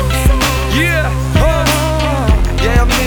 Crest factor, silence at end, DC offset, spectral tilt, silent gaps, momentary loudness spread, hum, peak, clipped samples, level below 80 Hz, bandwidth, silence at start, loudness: 12 dB; 0 s; under 0.1%; -5 dB/octave; none; 2 LU; none; 0 dBFS; under 0.1%; -14 dBFS; over 20 kHz; 0 s; -13 LUFS